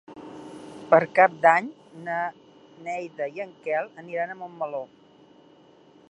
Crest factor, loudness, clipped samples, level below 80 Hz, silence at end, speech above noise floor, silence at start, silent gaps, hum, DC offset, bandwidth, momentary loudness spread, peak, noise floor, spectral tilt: 24 dB; -25 LUFS; under 0.1%; -76 dBFS; 1.25 s; 30 dB; 0.1 s; none; none; under 0.1%; 10.5 kHz; 23 LU; -2 dBFS; -54 dBFS; -6 dB/octave